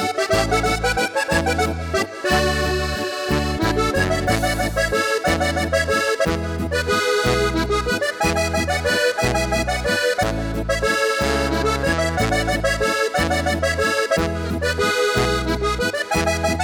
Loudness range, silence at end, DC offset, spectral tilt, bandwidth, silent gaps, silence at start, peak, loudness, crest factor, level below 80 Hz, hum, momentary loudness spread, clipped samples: 1 LU; 0 s; under 0.1%; -4 dB/octave; 19.5 kHz; none; 0 s; -4 dBFS; -20 LUFS; 16 dB; -30 dBFS; none; 4 LU; under 0.1%